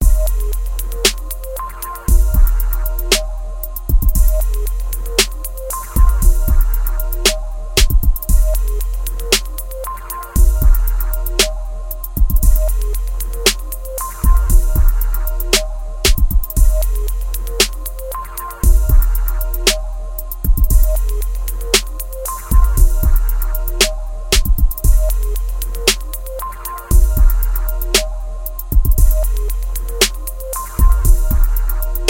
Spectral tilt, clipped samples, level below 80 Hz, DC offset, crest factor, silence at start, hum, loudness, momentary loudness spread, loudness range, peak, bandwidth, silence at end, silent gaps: -3.5 dB/octave; under 0.1%; -14 dBFS; under 0.1%; 14 dB; 0 s; none; -18 LUFS; 11 LU; 1 LU; 0 dBFS; 17.5 kHz; 0 s; none